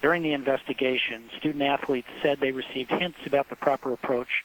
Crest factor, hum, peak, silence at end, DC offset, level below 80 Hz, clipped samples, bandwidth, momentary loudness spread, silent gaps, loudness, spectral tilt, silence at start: 20 dB; none; -8 dBFS; 0 s; under 0.1%; -64 dBFS; under 0.1%; 19 kHz; 5 LU; none; -27 LUFS; -6 dB/octave; 0 s